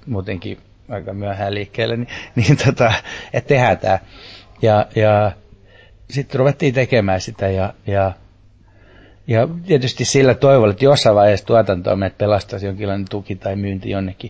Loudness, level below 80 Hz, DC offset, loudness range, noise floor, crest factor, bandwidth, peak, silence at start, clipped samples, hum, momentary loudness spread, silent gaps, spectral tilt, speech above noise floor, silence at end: -17 LUFS; -40 dBFS; under 0.1%; 5 LU; -48 dBFS; 16 dB; 8 kHz; -2 dBFS; 0.05 s; under 0.1%; none; 14 LU; none; -6 dB/octave; 32 dB; 0 s